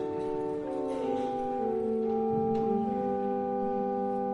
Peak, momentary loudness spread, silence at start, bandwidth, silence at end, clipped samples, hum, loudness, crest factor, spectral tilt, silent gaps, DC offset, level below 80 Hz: -18 dBFS; 4 LU; 0 s; 10.5 kHz; 0 s; under 0.1%; none; -31 LUFS; 12 dB; -8.5 dB/octave; none; under 0.1%; -60 dBFS